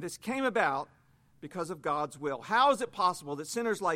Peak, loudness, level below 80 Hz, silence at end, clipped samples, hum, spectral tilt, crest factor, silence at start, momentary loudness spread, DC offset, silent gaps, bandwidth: -12 dBFS; -31 LUFS; -74 dBFS; 0 s; under 0.1%; none; -3.5 dB/octave; 18 dB; 0 s; 13 LU; under 0.1%; none; 16.5 kHz